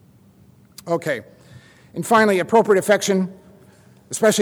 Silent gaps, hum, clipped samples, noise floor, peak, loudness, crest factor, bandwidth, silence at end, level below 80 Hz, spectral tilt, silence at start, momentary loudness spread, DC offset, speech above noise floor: none; none; under 0.1%; -51 dBFS; -4 dBFS; -19 LUFS; 16 dB; over 20 kHz; 0 s; -64 dBFS; -4.5 dB/octave; 0.85 s; 15 LU; under 0.1%; 33 dB